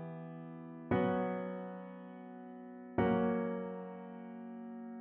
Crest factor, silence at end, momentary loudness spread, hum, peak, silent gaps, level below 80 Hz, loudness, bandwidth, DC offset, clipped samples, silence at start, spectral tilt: 20 dB; 0 s; 17 LU; none; -20 dBFS; none; -66 dBFS; -38 LUFS; 3.9 kHz; under 0.1%; under 0.1%; 0 s; -7 dB/octave